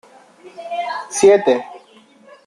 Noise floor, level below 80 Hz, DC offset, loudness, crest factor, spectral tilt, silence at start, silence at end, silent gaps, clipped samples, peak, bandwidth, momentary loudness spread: -48 dBFS; -64 dBFS; under 0.1%; -16 LUFS; 18 dB; -3.5 dB/octave; 0.45 s; 0.7 s; none; under 0.1%; -2 dBFS; 12 kHz; 21 LU